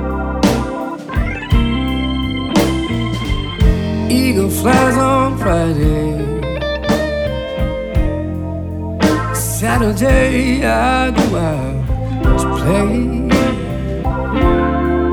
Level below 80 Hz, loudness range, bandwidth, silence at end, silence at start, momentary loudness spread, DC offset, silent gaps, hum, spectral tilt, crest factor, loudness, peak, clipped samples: -22 dBFS; 3 LU; over 20 kHz; 0 s; 0 s; 7 LU; under 0.1%; none; none; -6 dB/octave; 14 dB; -16 LUFS; 0 dBFS; under 0.1%